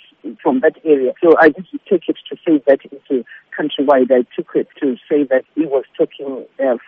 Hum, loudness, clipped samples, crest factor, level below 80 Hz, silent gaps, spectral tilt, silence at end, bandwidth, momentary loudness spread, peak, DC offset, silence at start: none; -16 LUFS; under 0.1%; 16 dB; -64 dBFS; none; -3.5 dB/octave; 0.1 s; 4.9 kHz; 11 LU; 0 dBFS; under 0.1%; 0.25 s